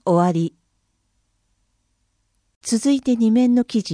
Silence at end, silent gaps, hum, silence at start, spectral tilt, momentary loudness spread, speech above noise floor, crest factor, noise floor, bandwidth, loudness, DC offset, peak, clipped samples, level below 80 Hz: 0 s; 2.56-2.61 s; 60 Hz at -50 dBFS; 0.05 s; -6 dB/octave; 9 LU; 51 dB; 16 dB; -69 dBFS; 10.5 kHz; -19 LUFS; under 0.1%; -6 dBFS; under 0.1%; -62 dBFS